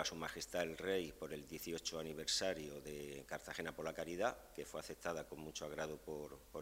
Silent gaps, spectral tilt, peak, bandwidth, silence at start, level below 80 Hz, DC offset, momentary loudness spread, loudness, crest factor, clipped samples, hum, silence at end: none; -3 dB/octave; -24 dBFS; 16 kHz; 0 s; -66 dBFS; under 0.1%; 10 LU; -45 LUFS; 22 dB; under 0.1%; none; 0 s